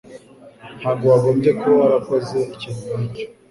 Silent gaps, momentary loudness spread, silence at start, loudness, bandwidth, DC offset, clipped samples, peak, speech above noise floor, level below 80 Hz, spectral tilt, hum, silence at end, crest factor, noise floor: none; 13 LU; 0.1 s; -18 LUFS; 11.5 kHz; under 0.1%; under 0.1%; -4 dBFS; 25 dB; -56 dBFS; -8 dB/octave; none; 0.25 s; 16 dB; -43 dBFS